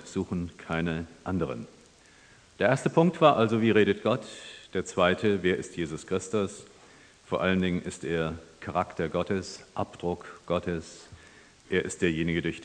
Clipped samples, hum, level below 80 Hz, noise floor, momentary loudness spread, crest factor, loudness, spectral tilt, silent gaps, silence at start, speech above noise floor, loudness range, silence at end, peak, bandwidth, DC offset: under 0.1%; none; -56 dBFS; -56 dBFS; 13 LU; 24 dB; -28 LUFS; -6 dB/octave; none; 0 s; 29 dB; 7 LU; 0 s; -6 dBFS; 10 kHz; under 0.1%